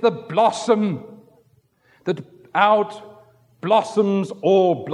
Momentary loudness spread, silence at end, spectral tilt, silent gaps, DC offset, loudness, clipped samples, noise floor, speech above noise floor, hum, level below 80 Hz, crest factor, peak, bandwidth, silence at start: 14 LU; 0 s; -6 dB/octave; none; under 0.1%; -20 LUFS; under 0.1%; -59 dBFS; 41 dB; none; -74 dBFS; 18 dB; -2 dBFS; 11 kHz; 0 s